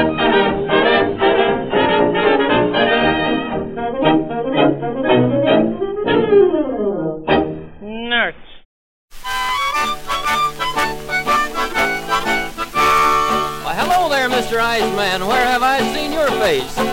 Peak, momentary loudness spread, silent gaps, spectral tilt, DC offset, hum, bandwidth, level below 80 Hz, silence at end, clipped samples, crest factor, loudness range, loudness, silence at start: -2 dBFS; 7 LU; 8.65-9.08 s; -4.5 dB/octave; under 0.1%; none; 16.5 kHz; -38 dBFS; 0 s; under 0.1%; 16 dB; 5 LU; -16 LUFS; 0 s